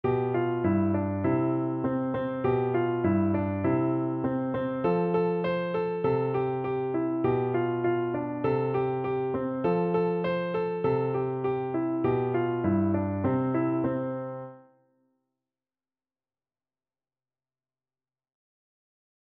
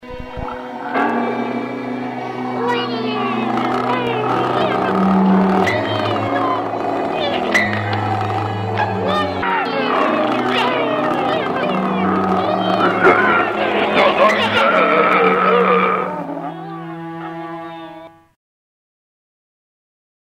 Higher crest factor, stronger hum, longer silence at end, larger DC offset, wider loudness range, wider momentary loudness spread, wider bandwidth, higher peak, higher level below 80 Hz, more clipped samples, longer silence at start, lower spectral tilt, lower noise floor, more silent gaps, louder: about the same, 16 dB vs 16 dB; neither; first, 4.7 s vs 2.25 s; neither; second, 4 LU vs 8 LU; second, 4 LU vs 14 LU; second, 4.5 kHz vs 13 kHz; second, -12 dBFS vs 0 dBFS; second, -60 dBFS vs -50 dBFS; neither; about the same, 0.05 s vs 0 s; first, -11.5 dB/octave vs -6.5 dB/octave; first, under -90 dBFS vs -38 dBFS; neither; second, -28 LUFS vs -17 LUFS